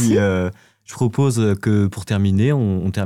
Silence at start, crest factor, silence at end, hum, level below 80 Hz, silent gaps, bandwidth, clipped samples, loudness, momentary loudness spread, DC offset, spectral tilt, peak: 0 s; 10 dB; 0 s; none; -48 dBFS; none; 15 kHz; under 0.1%; -19 LUFS; 6 LU; under 0.1%; -7 dB/octave; -8 dBFS